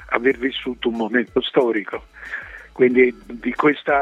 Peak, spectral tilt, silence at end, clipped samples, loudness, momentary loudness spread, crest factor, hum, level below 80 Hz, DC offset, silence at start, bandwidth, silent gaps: 0 dBFS; -6.5 dB/octave; 0 s; under 0.1%; -20 LUFS; 15 LU; 20 dB; none; -50 dBFS; under 0.1%; 0 s; 7 kHz; none